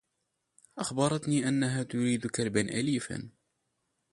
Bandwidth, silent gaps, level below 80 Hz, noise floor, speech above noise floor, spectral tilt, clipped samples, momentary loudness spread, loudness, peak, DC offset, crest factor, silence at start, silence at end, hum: 11.5 kHz; none; -64 dBFS; -81 dBFS; 51 dB; -5 dB/octave; under 0.1%; 12 LU; -30 LUFS; -12 dBFS; under 0.1%; 20 dB; 0.75 s; 0.85 s; none